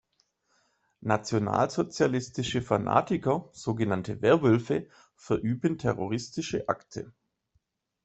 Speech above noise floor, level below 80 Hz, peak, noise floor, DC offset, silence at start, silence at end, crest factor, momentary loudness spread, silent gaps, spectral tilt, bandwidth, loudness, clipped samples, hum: 47 dB; -60 dBFS; -6 dBFS; -74 dBFS; under 0.1%; 1 s; 0.95 s; 22 dB; 8 LU; none; -6 dB/octave; 8.2 kHz; -28 LUFS; under 0.1%; none